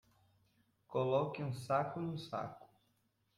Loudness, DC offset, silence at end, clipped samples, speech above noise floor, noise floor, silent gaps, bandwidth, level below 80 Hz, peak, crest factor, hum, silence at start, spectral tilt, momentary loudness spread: -39 LUFS; under 0.1%; 0.7 s; under 0.1%; 41 dB; -79 dBFS; none; 13.5 kHz; -74 dBFS; -20 dBFS; 20 dB; none; 0.9 s; -7 dB/octave; 9 LU